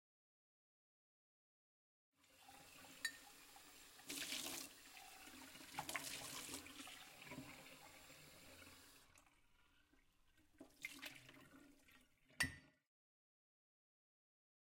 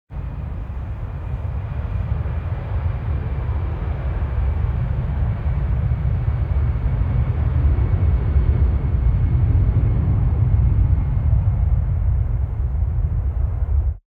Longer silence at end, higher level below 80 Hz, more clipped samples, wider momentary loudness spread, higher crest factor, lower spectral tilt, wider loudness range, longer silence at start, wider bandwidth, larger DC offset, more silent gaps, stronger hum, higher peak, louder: first, 1.95 s vs 0.1 s; second, -80 dBFS vs -22 dBFS; neither; first, 20 LU vs 9 LU; first, 30 dB vs 14 dB; second, -1.5 dB/octave vs -11 dB/octave; first, 10 LU vs 6 LU; first, 2.2 s vs 0.1 s; first, 16.5 kHz vs 3.6 kHz; neither; neither; neither; second, -26 dBFS vs -6 dBFS; second, -52 LUFS vs -21 LUFS